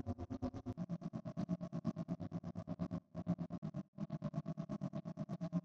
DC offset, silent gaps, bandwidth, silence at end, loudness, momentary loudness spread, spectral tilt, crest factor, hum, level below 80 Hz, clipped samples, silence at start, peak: under 0.1%; 3.58-3.62 s, 3.88-3.93 s; 7 kHz; 0 s; -45 LUFS; 4 LU; -9.5 dB/octave; 18 dB; none; -64 dBFS; under 0.1%; 0.05 s; -28 dBFS